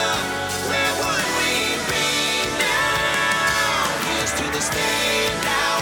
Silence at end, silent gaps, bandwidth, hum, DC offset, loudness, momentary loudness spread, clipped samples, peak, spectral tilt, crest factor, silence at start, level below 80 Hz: 0 s; none; over 20 kHz; none; under 0.1%; -20 LUFS; 3 LU; under 0.1%; -4 dBFS; -1.5 dB/octave; 16 dB; 0 s; -44 dBFS